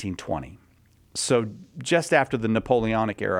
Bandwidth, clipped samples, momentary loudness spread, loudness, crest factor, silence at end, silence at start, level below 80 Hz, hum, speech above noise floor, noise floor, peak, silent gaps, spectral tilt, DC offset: 16 kHz; under 0.1%; 14 LU; -24 LUFS; 20 dB; 0 s; 0 s; -50 dBFS; none; 34 dB; -58 dBFS; -6 dBFS; none; -4.5 dB/octave; under 0.1%